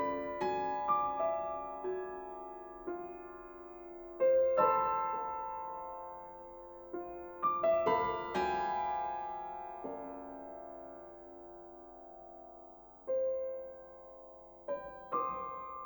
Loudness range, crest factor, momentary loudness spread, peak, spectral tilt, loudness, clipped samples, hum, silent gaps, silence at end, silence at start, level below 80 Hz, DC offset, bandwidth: 10 LU; 20 dB; 21 LU; -16 dBFS; -6.5 dB/octave; -36 LUFS; under 0.1%; none; none; 0 s; 0 s; -66 dBFS; under 0.1%; over 20 kHz